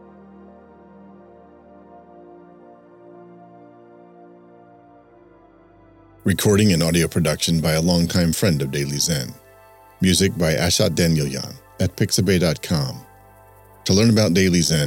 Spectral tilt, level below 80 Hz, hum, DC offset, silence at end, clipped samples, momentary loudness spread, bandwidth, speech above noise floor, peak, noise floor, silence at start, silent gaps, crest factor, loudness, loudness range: -4.5 dB/octave; -44 dBFS; none; under 0.1%; 0 s; under 0.1%; 10 LU; 17 kHz; 32 dB; -4 dBFS; -50 dBFS; 1.95 s; none; 18 dB; -19 LUFS; 3 LU